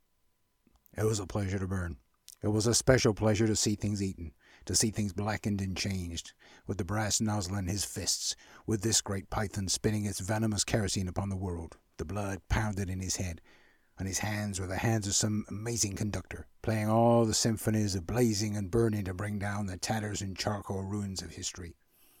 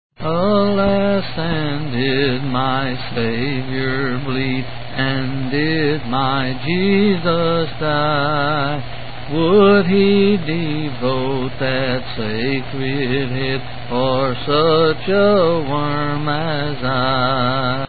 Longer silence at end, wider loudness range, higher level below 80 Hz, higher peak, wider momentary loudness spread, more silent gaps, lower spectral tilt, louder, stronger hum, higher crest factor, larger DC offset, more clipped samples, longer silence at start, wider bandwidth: first, 0.5 s vs 0 s; about the same, 5 LU vs 4 LU; second, -50 dBFS vs -40 dBFS; second, -10 dBFS vs 0 dBFS; first, 13 LU vs 8 LU; neither; second, -4.5 dB/octave vs -11.5 dB/octave; second, -31 LUFS vs -18 LUFS; neither; first, 22 dB vs 16 dB; second, under 0.1% vs 5%; neither; first, 0.95 s vs 0.1 s; first, 17 kHz vs 4.8 kHz